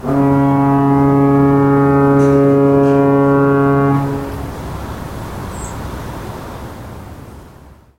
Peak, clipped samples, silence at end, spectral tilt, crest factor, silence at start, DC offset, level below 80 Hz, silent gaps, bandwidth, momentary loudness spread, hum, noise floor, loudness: -2 dBFS; under 0.1%; 0.3 s; -8.5 dB/octave; 12 dB; 0 s; 0.3%; -34 dBFS; none; 15.5 kHz; 18 LU; none; -41 dBFS; -12 LUFS